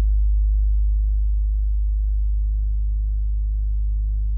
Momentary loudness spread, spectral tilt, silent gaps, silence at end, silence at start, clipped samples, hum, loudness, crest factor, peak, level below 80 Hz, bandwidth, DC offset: 4 LU; -19 dB/octave; none; 0 s; 0 s; under 0.1%; none; -24 LUFS; 6 dB; -14 dBFS; -20 dBFS; 0.1 kHz; under 0.1%